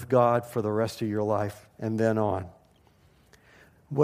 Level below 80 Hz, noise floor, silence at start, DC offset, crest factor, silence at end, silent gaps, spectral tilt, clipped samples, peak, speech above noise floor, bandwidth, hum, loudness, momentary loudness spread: -64 dBFS; -61 dBFS; 0 s; under 0.1%; 18 dB; 0 s; none; -7.5 dB/octave; under 0.1%; -10 dBFS; 34 dB; 15.5 kHz; none; -28 LUFS; 12 LU